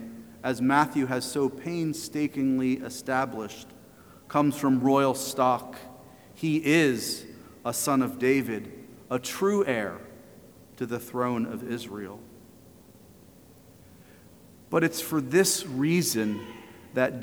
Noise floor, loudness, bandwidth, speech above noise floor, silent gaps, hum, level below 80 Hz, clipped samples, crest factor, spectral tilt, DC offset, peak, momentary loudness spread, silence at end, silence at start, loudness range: -53 dBFS; -27 LUFS; over 20 kHz; 27 dB; none; none; -66 dBFS; under 0.1%; 22 dB; -4.5 dB/octave; under 0.1%; -8 dBFS; 18 LU; 0 s; 0 s; 9 LU